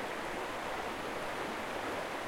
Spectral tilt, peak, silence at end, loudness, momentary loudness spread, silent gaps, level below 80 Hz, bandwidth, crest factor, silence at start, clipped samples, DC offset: -3.5 dB/octave; -26 dBFS; 0 s; -38 LUFS; 1 LU; none; -60 dBFS; 16.5 kHz; 14 dB; 0 s; under 0.1%; under 0.1%